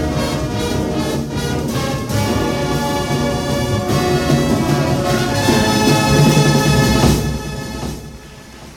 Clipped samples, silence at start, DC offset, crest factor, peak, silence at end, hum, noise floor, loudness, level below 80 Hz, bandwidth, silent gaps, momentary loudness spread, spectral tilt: under 0.1%; 0 s; under 0.1%; 14 dB; -2 dBFS; 0 s; none; -36 dBFS; -16 LUFS; -30 dBFS; 17.5 kHz; none; 13 LU; -5 dB/octave